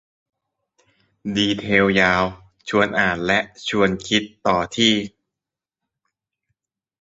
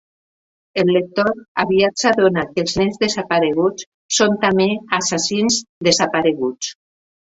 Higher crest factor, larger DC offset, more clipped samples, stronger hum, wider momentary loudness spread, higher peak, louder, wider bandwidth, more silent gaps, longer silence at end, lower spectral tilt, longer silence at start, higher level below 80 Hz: about the same, 20 dB vs 18 dB; neither; neither; neither; first, 9 LU vs 6 LU; about the same, -2 dBFS vs 0 dBFS; about the same, -19 LUFS vs -17 LUFS; about the same, 7.8 kHz vs 8.2 kHz; second, none vs 1.48-1.55 s, 3.86-4.09 s, 5.69-5.81 s; first, 1.95 s vs 0.65 s; about the same, -4.5 dB/octave vs -3.5 dB/octave; first, 1.25 s vs 0.75 s; about the same, -50 dBFS vs -52 dBFS